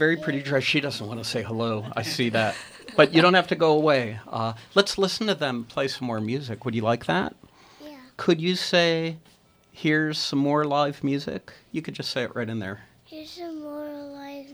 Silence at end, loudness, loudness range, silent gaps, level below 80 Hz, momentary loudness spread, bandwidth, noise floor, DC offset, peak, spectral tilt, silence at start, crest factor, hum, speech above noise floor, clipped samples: 0 s; -24 LUFS; 6 LU; none; -64 dBFS; 17 LU; over 20 kHz; -47 dBFS; under 0.1%; -2 dBFS; -5 dB/octave; 0 s; 22 dB; none; 23 dB; under 0.1%